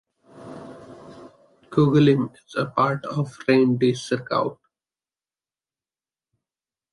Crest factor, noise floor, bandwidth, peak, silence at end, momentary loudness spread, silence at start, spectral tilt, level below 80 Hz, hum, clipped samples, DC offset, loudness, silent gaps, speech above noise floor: 20 dB; under -90 dBFS; 11.5 kHz; -6 dBFS; 2.4 s; 23 LU; 0.35 s; -7 dB/octave; -64 dBFS; none; under 0.1%; under 0.1%; -22 LUFS; none; over 69 dB